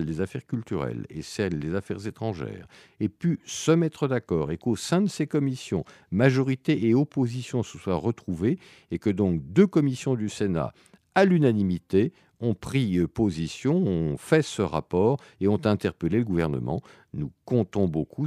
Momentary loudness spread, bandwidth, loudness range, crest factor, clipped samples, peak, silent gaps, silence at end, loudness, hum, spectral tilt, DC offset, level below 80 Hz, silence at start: 10 LU; 13.5 kHz; 4 LU; 20 dB; under 0.1%; -6 dBFS; none; 0 s; -26 LUFS; none; -7 dB/octave; under 0.1%; -52 dBFS; 0 s